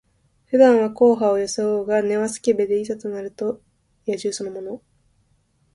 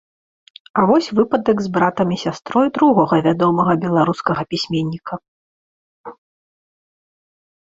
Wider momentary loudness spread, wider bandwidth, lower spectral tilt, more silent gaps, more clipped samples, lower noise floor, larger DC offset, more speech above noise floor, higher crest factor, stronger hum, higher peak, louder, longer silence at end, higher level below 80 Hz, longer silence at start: first, 17 LU vs 9 LU; first, 11.5 kHz vs 7.8 kHz; second, -5 dB/octave vs -7 dB/octave; second, none vs 5.28-6.04 s; neither; second, -63 dBFS vs under -90 dBFS; neither; second, 44 dB vs over 73 dB; about the same, 20 dB vs 16 dB; neither; about the same, -2 dBFS vs -2 dBFS; second, -20 LUFS vs -17 LUFS; second, 1 s vs 1.6 s; second, -62 dBFS vs -56 dBFS; second, 0.5 s vs 0.75 s